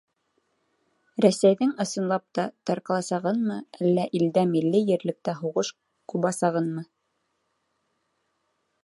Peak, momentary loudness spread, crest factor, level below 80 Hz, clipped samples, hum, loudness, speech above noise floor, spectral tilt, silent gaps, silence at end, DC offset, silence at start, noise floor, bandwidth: -6 dBFS; 9 LU; 20 dB; -76 dBFS; under 0.1%; none; -25 LUFS; 51 dB; -6 dB/octave; none; 2 s; under 0.1%; 1.2 s; -75 dBFS; 11.5 kHz